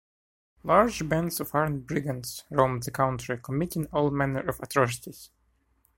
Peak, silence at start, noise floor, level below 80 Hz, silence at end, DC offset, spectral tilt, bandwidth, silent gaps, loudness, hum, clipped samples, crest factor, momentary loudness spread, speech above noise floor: -6 dBFS; 0.65 s; -69 dBFS; -52 dBFS; 0.7 s; under 0.1%; -5.5 dB/octave; 16.5 kHz; none; -27 LUFS; none; under 0.1%; 22 dB; 11 LU; 42 dB